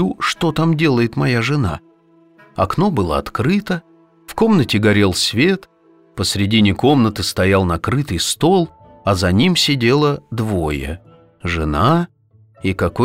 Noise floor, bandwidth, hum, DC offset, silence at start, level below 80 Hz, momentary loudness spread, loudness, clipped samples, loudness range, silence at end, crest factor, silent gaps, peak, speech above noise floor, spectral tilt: -51 dBFS; 16 kHz; none; under 0.1%; 0 s; -38 dBFS; 11 LU; -16 LUFS; under 0.1%; 3 LU; 0 s; 14 dB; none; -2 dBFS; 35 dB; -5.5 dB/octave